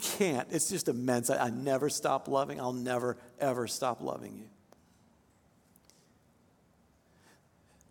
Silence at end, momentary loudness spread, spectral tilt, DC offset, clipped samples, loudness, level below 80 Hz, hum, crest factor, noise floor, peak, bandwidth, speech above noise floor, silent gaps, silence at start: 3.4 s; 8 LU; -4 dB/octave; under 0.1%; under 0.1%; -32 LUFS; -74 dBFS; none; 20 dB; -67 dBFS; -14 dBFS; 17.5 kHz; 35 dB; none; 0 s